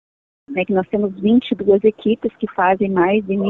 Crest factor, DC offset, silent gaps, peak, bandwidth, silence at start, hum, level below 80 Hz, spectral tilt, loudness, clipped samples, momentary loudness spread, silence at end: 14 dB; under 0.1%; none; -4 dBFS; 4.1 kHz; 0.5 s; none; -52 dBFS; -9.5 dB/octave; -18 LUFS; under 0.1%; 7 LU; 0 s